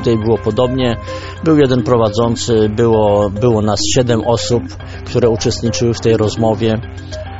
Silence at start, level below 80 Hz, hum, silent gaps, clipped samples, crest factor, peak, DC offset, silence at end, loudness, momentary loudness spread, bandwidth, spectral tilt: 0 s; -36 dBFS; none; none; under 0.1%; 14 dB; 0 dBFS; 0.9%; 0 s; -14 LUFS; 8 LU; 8 kHz; -6 dB/octave